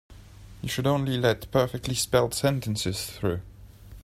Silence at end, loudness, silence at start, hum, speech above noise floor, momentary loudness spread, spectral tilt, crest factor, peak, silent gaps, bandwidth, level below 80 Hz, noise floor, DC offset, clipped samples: 0 s; -26 LUFS; 0.1 s; none; 21 dB; 7 LU; -5 dB/octave; 20 dB; -6 dBFS; none; 16 kHz; -48 dBFS; -47 dBFS; under 0.1%; under 0.1%